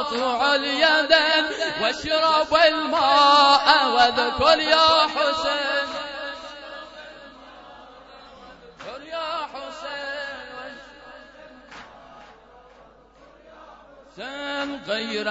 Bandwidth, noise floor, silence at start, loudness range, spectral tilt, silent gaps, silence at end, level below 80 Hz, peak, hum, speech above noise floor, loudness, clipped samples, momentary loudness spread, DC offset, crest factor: 8 kHz; -51 dBFS; 0 s; 20 LU; -2 dB/octave; none; 0 s; -56 dBFS; 0 dBFS; none; 32 dB; -19 LUFS; under 0.1%; 22 LU; under 0.1%; 22 dB